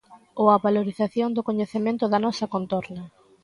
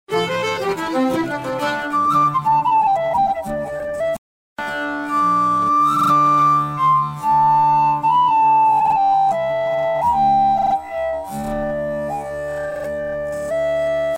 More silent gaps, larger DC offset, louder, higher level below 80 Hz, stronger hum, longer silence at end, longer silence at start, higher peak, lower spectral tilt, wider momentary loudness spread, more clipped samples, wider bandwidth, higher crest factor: second, none vs 4.18-4.56 s; neither; second, -24 LUFS vs -18 LUFS; second, -66 dBFS vs -48 dBFS; neither; first, 0.35 s vs 0 s; about the same, 0.1 s vs 0.1 s; first, -4 dBFS vs -8 dBFS; first, -7 dB/octave vs -5.5 dB/octave; about the same, 11 LU vs 11 LU; neither; second, 11 kHz vs 16 kHz; first, 20 dB vs 10 dB